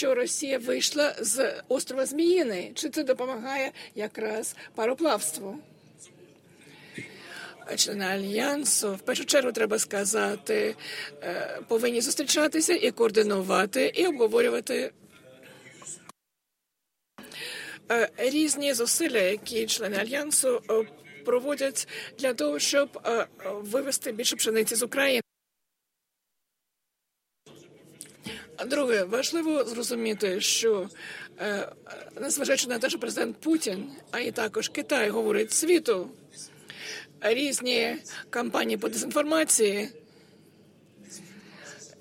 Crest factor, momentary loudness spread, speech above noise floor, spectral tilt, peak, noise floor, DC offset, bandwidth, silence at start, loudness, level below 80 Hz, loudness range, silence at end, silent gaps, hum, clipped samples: 20 dB; 17 LU; 56 dB; -2 dB/octave; -8 dBFS; -83 dBFS; under 0.1%; 16.5 kHz; 0 s; -27 LUFS; -76 dBFS; 6 LU; 0.1 s; none; none; under 0.1%